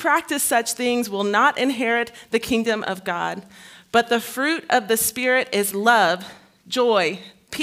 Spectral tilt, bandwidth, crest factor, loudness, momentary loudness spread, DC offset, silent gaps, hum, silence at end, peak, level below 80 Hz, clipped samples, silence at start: -2.5 dB/octave; 16 kHz; 20 dB; -21 LUFS; 9 LU; under 0.1%; none; none; 0 s; -2 dBFS; -62 dBFS; under 0.1%; 0 s